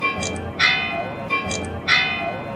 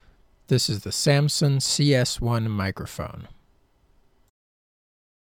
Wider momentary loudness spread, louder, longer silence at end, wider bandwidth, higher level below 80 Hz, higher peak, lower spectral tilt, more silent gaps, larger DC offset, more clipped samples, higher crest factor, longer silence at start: second, 9 LU vs 14 LU; first, -20 LUFS vs -23 LUFS; second, 0 s vs 1.95 s; second, 14 kHz vs 17 kHz; about the same, -46 dBFS vs -48 dBFS; first, -4 dBFS vs -8 dBFS; second, -3 dB/octave vs -4.5 dB/octave; neither; neither; neither; about the same, 18 dB vs 18 dB; second, 0 s vs 0.5 s